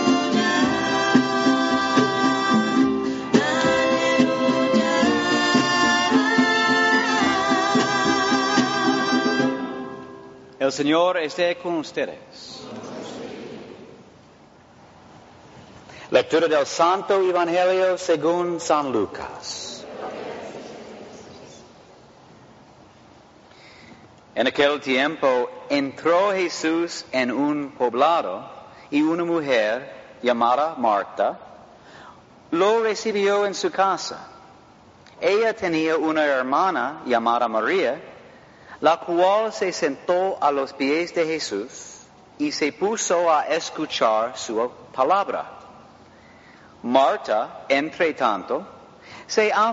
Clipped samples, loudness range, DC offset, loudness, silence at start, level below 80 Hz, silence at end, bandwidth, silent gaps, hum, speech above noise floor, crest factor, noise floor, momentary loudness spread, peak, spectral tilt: under 0.1%; 10 LU; under 0.1%; -21 LUFS; 0 s; -62 dBFS; 0 s; 8 kHz; none; none; 29 dB; 20 dB; -50 dBFS; 15 LU; -2 dBFS; -2.5 dB/octave